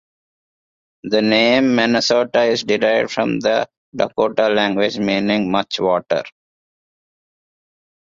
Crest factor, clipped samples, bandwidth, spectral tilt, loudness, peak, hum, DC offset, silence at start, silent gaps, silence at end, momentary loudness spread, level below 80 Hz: 16 dB; under 0.1%; 7.6 kHz; -4.5 dB/octave; -17 LUFS; -2 dBFS; none; under 0.1%; 1.05 s; 3.77-3.92 s; 1.85 s; 8 LU; -58 dBFS